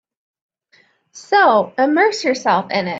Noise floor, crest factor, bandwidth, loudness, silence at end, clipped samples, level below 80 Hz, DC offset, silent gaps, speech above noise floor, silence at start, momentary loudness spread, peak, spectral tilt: -56 dBFS; 14 dB; 8 kHz; -15 LUFS; 0 s; under 0.1%; -66 dBFS; under 0.1%; none; 41 dB; 1.15 s; 5 LU; -2 dBFS; -4 dB/octave